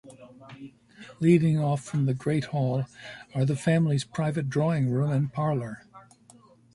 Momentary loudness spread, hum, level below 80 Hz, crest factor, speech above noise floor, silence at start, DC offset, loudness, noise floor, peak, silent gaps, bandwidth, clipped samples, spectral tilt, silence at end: 17 LU; none; -62 dBFS; 18 dB; 31 dB; 0.05 s; under 0.1%; -26 LUFS; -56 dBFS; -8 dBFS; none; 11.5 kHz; under 0.1%; -7.5 dB/octave; 0.75 s